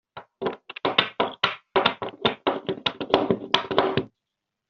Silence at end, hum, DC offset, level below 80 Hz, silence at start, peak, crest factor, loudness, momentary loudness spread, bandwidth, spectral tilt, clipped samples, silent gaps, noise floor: 0.65 s; none; under 0.1%; -62 dBFS; 0.15 s; 0 dBFS; 26 dB; -25 LUFS; 9 LU; 7 kHz; -1.5 dB/octave; under 0.1%; none; -84 dBFS